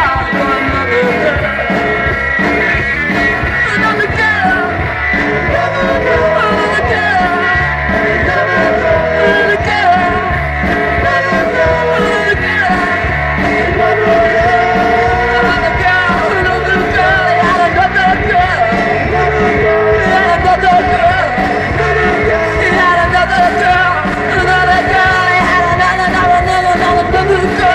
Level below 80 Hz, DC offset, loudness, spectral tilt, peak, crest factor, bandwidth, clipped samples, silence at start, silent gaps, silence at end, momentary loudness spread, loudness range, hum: -26 dBFS; under 0.1%; -11 LUFS; -5.5 dB/octave; -2 dBFS; 10 dB; 12 kHz; under 0.1%; 0 s; none; 0 s; 3 LU; 2 LU; none